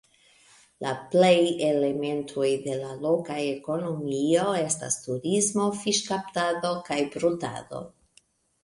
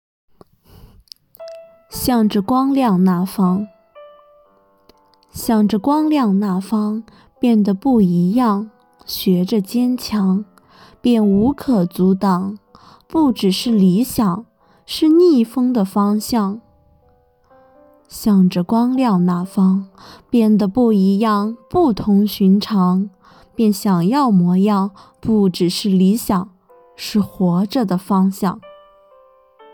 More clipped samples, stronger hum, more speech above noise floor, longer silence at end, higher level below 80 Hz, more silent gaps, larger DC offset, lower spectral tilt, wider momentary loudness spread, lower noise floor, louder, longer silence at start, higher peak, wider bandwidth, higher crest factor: neither; neither; about the same, 37 dB vs 40 dB; second, 0.75 s vs 1.05 s; second, -68 dBFS vs -48 dBFS; neither; neither; second, -4 dB/octave vs -7 dB/octave; about the same, 11 LU vs 13 LU; first, -63 dBFS vs -55 dBFS; second, -26 LUFS vs -16 LUFS; second, 0.8 s vs 1.4 s; second, -8 dBFS vs -4 dBFS; second, 11.5 kHz vs 19 kHz; first, 18 dB vs 12 dB